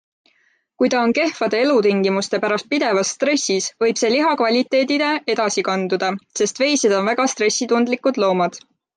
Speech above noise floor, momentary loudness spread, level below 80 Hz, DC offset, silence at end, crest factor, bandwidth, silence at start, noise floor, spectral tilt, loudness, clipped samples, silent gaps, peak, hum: 44 dB; 4 LU; -68 dBFS; under 0.1%; 0.4 s; 14 dB; 10.5 kHz; 0.8 s; -62 dBFS; -3.5 dB/octave; -18 LUFS; under 0.1%; none; -6 dBFS; none